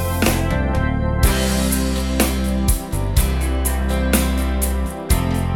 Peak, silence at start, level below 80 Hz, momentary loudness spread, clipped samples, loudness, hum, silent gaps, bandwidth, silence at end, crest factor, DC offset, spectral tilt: 0 dBFS; 0 s; -22 dBFS; 3 LU; under 0.1%; -19 LUFS; none; none; 18.5 kHz; 0 s; 18 dB; 0.5%; -5 dB/octave